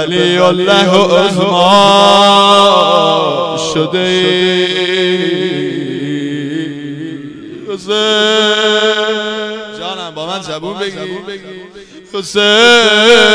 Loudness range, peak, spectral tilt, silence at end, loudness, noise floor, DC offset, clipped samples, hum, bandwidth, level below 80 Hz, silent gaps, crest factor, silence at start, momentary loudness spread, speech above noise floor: 9 LU; 0 dBFS; -3.5 dB/octave; 0 s; -10 LUFS; -34 dBFS; under 0.1%; 1%; none; 11 kHz; -52 dBFS; none; 12 dB; 0 s; 18 LU; 24 dB